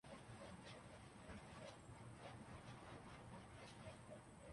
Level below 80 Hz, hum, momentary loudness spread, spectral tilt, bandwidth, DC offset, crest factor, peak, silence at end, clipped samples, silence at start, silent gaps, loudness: -70 dBFS; none; 2 LU; -5 dB/octave; 11.5 kHz; under 0.1%; 14 dB; -44 dBFS; 0 s; under 0.1%; 0.05 s; none; -59 LUFS